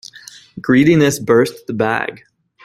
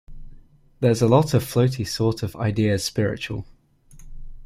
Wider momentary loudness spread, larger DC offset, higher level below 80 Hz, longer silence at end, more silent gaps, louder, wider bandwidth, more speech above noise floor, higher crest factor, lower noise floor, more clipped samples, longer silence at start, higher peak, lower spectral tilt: first, 16 LU vs 9 LU; neither; second, -52 dBFS vs -44 dBFS; first, 0.5 s vs 0 s; neither; first, -15 LUFS vs -22 LUFS; about the same, 15 kHz vs 16 kHz; about the same, 26 dB vs 28 dB; second, 14 dB vs 20 dB; second, -40 dBFS vs -49 dBFS; neither; first, 0.55 s vs 0.1 s; about the same, -2 dBFS vs -2 dBFS; about the same, -6 dB/octave vs -6 dB/octave